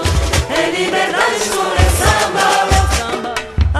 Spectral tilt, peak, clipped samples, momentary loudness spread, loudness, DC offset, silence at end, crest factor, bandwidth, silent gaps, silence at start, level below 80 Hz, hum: -4 dB/octave; 0 dBFS; under 0.1%; 6 LU; -14 LUFS; under 0.1%; 0 s; 14 dB; 13 kHz; none; 0 s; -20 dBFS; none